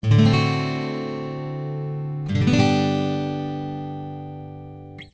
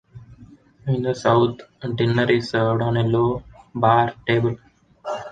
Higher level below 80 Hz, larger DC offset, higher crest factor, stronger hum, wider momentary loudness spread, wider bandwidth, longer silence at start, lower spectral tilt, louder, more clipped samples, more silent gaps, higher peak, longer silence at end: first, -44 dBFS vs -50 dBFS; neither; about the same, 18 dB vs 20 dB; neither; first, 18 LU vs 14 LU; second, 8 kHz vs 9 kHz; about the same, 0.05 s vs 0.15 s; about the same, -7 dB/octave vs -7.5 dB/octave; about the same, -23 LUFS vs -21 LUFS; neither; neither; about the same, -4 dBFS vs -2 dBFS; about the same, 0.05 s vs 0 s